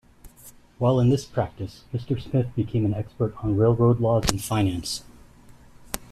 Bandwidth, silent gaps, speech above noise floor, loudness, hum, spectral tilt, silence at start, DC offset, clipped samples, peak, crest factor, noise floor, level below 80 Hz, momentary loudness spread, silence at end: 14.5 kHz; none; 27 dB; -24 LUFS; none; -6.5 dB/octave; 0.25 s; under 0.1%; under 0.1%; 0 dBFS; 24 dB; -50 dBFS; -44 dBFS; 13 LU; 0.1 s